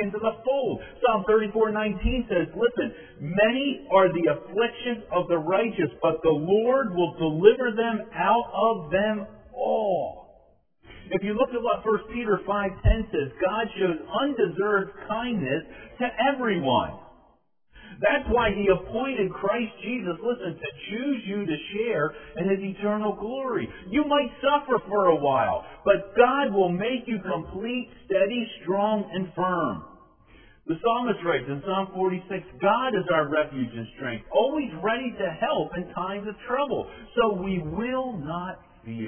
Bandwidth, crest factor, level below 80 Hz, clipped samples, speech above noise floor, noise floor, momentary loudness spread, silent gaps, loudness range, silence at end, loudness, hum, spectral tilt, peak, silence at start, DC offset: 3.5 kHz; 22 dB; -42 dBFS; under 0.1%; 38 dB; -63 dBFS; 9 LU; none; 5 LU; 0 s; -26 LUFS; none; -10 dB/octave; -2 dBFS; 0 s; under 0.1%